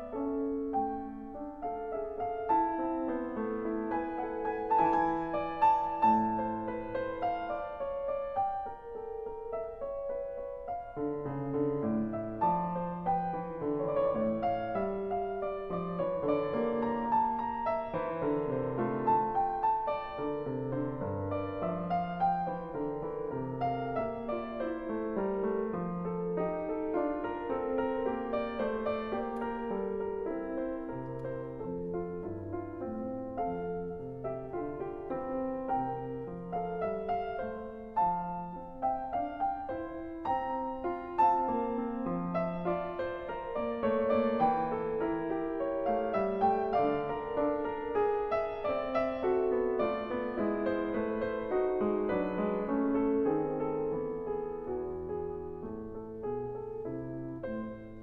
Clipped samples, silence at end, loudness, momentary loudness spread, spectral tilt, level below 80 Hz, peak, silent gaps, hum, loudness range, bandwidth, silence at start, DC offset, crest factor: under 0.1%; 0 s; -34 LUFS; 10 LU; -9.5 dB/octave; -56 dBFS; -16 dBFS; none; none; 6 LU; 5.8 kHz; 0 s; under 0.1%; 18 dB